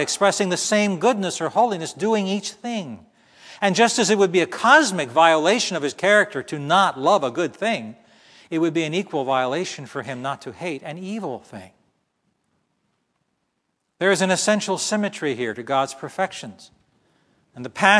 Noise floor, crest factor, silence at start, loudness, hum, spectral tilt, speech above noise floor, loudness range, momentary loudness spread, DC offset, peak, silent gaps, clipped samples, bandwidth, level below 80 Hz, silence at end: -74 dBFS; 22 dB; 0 s; -21 LUFS; none; -3.5 dB/octave; 53 dB; 14 LU; 13 LU; under 0.1%; 0 dBFS; none; under 0.1%; 11 kHz; -72 dBFS; 0 s